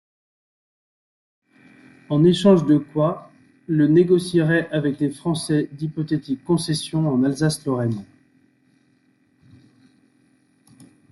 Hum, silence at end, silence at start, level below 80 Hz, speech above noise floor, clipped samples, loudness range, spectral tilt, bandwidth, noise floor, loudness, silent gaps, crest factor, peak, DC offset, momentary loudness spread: none; 3.1 s; 2.1 s; -60 dBFS; 42 dB; under 0.1%; 8 LU; -6.5 dB/octave; 12 kHz; -62 dBFS; -20 LUFS; none; 18 dB; -4 dBFS; under 0.1%; 10 LU